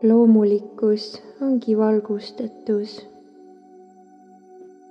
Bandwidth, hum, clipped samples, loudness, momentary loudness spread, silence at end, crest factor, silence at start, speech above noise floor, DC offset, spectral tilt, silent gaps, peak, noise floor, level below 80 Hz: 6.4 kHz; 50 Hz at -55 dBFS; under 0.1%; -20 LUFS; 17 LU; 0.3 s; 16 dB; 0 s; 29 dB; under 0.1%; -8.5 dB/octave; none; -6 dBFS; -49 dBFS; -78 dBFS